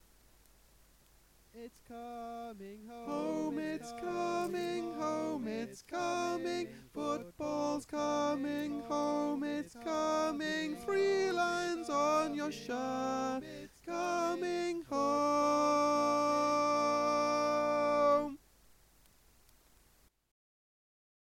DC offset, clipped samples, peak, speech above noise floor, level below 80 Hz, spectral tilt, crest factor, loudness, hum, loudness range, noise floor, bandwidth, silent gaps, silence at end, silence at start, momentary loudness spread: under 0.1%; under 0.1%; -18 dBFS; 33 dB; -68 dBFS; -4 dB/octave; 16 dB; -34 LUFS; none; 9 LU; -68 dBFS; 16.5 kHz; none; 2.95 s; 1.55 s; 14 LU